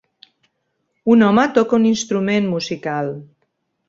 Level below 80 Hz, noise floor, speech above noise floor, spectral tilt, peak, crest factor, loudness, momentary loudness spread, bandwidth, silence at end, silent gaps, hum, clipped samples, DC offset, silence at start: -60 dBFS; -71 dBFS; 55 dB; -5.5 dB/octave; -2 dBFS; 16 dB; -17 LUFS; 12 LU; 7.8 kHz; 0.65 s; none; none; under 0.1%; under 0.1%; 1.05 s